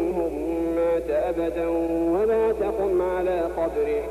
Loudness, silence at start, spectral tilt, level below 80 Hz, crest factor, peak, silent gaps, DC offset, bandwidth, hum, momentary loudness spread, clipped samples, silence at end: -24 LUFS; 0 s; -7.5 dB/octave; -42 dBFS; 8 dB; -14 dBFS; none; under 0.1%; 14 kHz; none; 4 LU; under 0.1%; 0 s